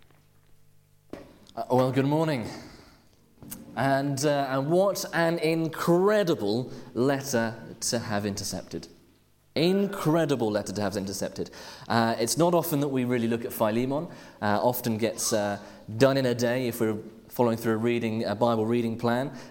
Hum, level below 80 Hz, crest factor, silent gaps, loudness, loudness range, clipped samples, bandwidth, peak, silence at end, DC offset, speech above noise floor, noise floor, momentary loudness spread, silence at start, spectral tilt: none; -62 dBFS; 20 dB; none; -27 LUFS; 4 LU; under 0.1%; 17 kHz; -6 dBFS; 0 s; under 0.1%; 35 dB; -61 dBFS; 14 LU; 1.15 s; -5 dB/octave